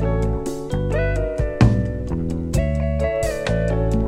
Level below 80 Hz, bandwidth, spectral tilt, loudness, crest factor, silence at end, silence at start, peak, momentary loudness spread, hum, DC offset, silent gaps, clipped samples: -26 dBFS; 14.5 kHz; -7.5 dB/octave; -22 LUFS; 18 dB; 0 s; 0 s; -2 dBFS; 7 LU; none; under 0.1%; none; under 0.1%